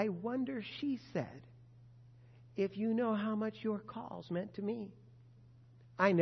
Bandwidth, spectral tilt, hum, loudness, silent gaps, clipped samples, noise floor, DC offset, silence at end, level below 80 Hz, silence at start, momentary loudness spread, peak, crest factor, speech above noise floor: 6.2 kHz; -5.5 dB/octave; none; -38 LUFS; none; under 0.1%; -60 dBFS; under 0.1%; 0 s; -74 dBFS; 0 s; 14 LU; -16 dBFS; 22 dB; 23 dB